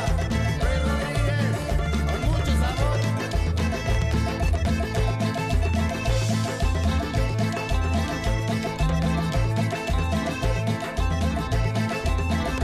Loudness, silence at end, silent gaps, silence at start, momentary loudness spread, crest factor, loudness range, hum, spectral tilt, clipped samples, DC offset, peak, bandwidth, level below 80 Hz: -25 LUFS; 0 s; none; 0 s; 2 LU; 12 dB; 1 LU; none; -6 dB/octave; under 0.1%; under 0.1%; -10 dBFS; 15 kHz; -28 dBFS